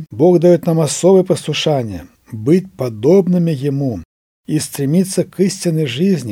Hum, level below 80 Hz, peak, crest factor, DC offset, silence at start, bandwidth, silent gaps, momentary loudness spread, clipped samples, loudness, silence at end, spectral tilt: none; -52 dBFS; 0 dBFS; 14 dB; under 0.1%; 0 s; 16.5 kHz; 4.05-4.44 s; 11 LU; under 0.1%; -15 LUFS; 0 s; -6 dB/octave